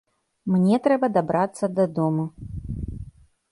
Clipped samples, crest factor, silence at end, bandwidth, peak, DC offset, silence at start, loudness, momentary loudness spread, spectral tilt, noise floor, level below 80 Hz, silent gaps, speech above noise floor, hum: under 0.1%; 18 dB; 0.45 s; 11.5 kHz; -6 dBFS; under 0.1%; 0.45 s; -23 LUFS; 16 LU; -8 dB/octave; -45 dBFS; -44 dBFS; none; 23 dB; none